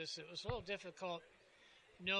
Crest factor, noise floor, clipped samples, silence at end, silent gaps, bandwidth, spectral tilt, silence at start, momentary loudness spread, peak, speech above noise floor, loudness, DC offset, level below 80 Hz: 20 dB; -67 dBFS; under 0.1%; 0 s; none; 11 kHz; -3.5 dB/octave; 0 s; 20 LU; -26 dBFS; 21 dB; -46 LUFS; under 0.1%; -66 dBFS